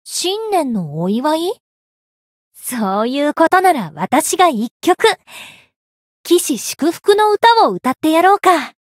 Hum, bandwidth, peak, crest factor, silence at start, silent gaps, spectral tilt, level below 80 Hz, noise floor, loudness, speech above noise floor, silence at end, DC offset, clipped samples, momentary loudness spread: none; 16.5 kHz; 0 dBFS; 16 dB; 0.05 s; 1.60-2.52 s, 4.71-4.80 s, 5.76-6.24 s; -3.5 dB/octave; -66 dBFS; under -90 dBFS; -15 LUFS; over 75 dB; 0.2 s; under 0.1%; under 0.1%; 12 LU